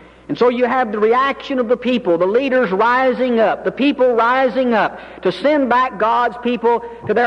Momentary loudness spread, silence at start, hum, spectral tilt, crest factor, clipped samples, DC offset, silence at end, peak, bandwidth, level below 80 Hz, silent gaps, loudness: 5 LU; 0.3 s; none; -6.5 dB/octave; 12 dB; under 0.1%; under 0.1%; 0 s; -4 dBFS; 7 kHz; -52 dBFS; none; -16 LUFS